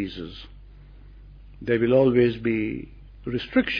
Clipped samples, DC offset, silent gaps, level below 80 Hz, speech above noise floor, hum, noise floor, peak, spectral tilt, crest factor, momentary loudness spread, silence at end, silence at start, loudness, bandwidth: under 0.1%; under 0.1%; none; -46 dBFS; 23 dB; none; -46 dBFS; -6 dBFS; -8.5 dB/octave; 18 dB; 20 LU; 0 s; 0 s; -23 LUFS; 5.2 kHz